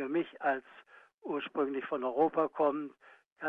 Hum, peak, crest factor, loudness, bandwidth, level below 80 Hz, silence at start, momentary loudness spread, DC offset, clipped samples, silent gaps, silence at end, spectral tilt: none; -16 dBFS; 18 dB; -33 LUFS; 4.3 kHz; -84 dBFS; 0 s; 10 LU; under 0.1%; under 0.1%; 1.14-1.18 s, 3.26-3.36 s; 0 s; -8 dB/octave